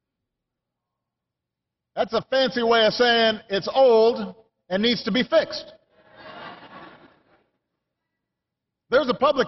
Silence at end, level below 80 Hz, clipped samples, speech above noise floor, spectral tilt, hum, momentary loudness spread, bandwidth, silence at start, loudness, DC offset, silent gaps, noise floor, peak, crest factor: 0 s; -62 dBFS; under 0.1%; 65 dB; -1.5 dB/octave; none; 19 LU; 6.2 kHz; 1.95 s; -21 LUFS; under 0.1%; none; -85 dBFS; -8 dBFS; 16 dB